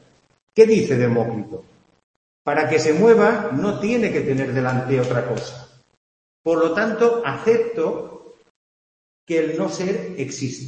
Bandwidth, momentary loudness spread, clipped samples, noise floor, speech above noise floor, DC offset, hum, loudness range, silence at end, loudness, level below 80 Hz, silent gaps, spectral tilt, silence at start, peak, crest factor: 8.6 kHz; 14 LU; under 0.1%; under -90 dBFS; over 71 dB; under 0.1%; none; 4 LU; 0 s; -20 LUFS; -60 dBFS; 2.03-2.45 s, 5.97-6.44 s, 8.50-9.27 s; -6 dB/octave; 0.55 s; 0 dBFS; 20 dB